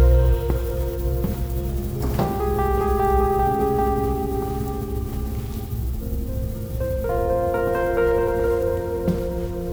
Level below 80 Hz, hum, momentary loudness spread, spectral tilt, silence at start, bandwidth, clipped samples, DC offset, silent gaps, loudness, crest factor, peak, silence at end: -26 dBFS; none; 9 LU; -8 dB/octave; 0 s; over 20 kHz; under 0.1%; under 0.1%; none; -23 LUFS; 16 dB; -6 dBFS; 0 s